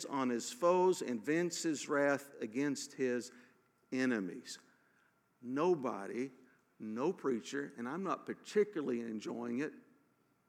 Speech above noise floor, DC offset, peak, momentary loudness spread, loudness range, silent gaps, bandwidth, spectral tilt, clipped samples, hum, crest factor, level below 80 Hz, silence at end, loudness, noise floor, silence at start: 38 dB; under 0.1%; -18 dBFS; 11 LU; 5 LU; none; 15.5 kHz; -4.5 dB/octave; under 0.1%; none; 18 dB; under -90 dBFS; 0.7 s; -37 LUFS; -74 dBFS; 0 s